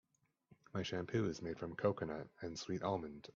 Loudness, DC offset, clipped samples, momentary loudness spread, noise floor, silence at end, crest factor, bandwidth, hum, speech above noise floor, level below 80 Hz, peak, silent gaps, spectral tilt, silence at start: -42 LUFS; under 0.1%; under 0.1%; 8 LU; -72 dBFS; 0.05 s; 22 dB; 7.4 kHz; none; 31 dB; -72 dBFS; -20 dBFS; none; -5.5 dB/octave; 0.5 s